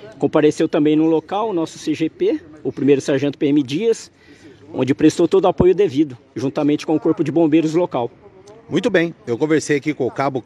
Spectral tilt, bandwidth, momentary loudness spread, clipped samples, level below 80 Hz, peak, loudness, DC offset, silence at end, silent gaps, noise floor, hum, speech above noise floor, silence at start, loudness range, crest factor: -6.5 dB/octave; 11 kHz; 8 LU; under 0.1%; -48 dBFS; 0 dBFS; -18 LUFS; under 0.1%; 0.05 s; none; -43 dBFS; none; 26 dB; 0 s; 3 LU; 18 dB